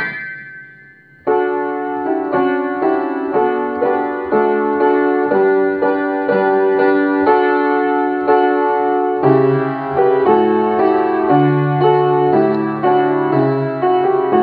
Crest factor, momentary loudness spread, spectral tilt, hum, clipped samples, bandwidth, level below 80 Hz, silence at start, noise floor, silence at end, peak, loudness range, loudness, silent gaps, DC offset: 14 dB; 6 LU; -10.5 dB/octave; none; under 0.1%; 4.8 kHz; -58 dBFS; 0 s; -44 dBFS; 0 s; 0 dBFS; 4 LU; -15 LUFS; none; under 0.1%